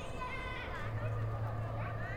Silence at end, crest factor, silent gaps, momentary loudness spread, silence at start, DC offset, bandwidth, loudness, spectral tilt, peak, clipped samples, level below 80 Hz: 0 s; 12 dB; none; 3 LU; 0 s; under 0.1%; 9.8 kHz; -40 LUFS; -7 dB/octave; -26 dBFS; under 0.1%; -48 dBFS